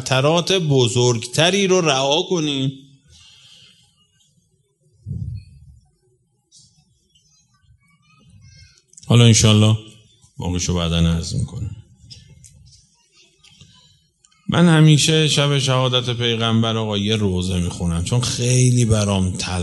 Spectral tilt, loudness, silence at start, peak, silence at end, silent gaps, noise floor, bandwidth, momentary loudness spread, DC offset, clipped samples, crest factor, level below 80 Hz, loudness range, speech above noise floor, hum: -4.5 dB/octave; -17 LUFS; 0 s; 0 dBFS; 0 s; none; -63 dBFS; 11.5 kHz; 14 LU; under 0.1%; under 0.1%; 20 dB; -42 dBFS; 22 LU; 46 dB; none